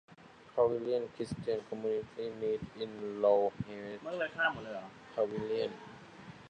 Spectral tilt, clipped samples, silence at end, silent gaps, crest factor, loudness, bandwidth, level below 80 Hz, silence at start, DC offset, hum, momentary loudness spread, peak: -6 dB/octave; under 0.1%; 0 s; none; 20 dB; -35 LUFS; 10 kHz; -68 dBFS; 0.1 s; under 0.1%; none; 13 LU; -16 dBFS